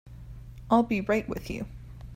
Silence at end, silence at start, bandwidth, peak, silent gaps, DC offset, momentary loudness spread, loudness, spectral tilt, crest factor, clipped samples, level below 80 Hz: 0 s; 0.05 s; 16 kHz; -10 dBFS; none; under 0.1%; 22 LU; -28 LUFS; -7 dB/octave; 20 dB; under 0.1%; -46 dBFS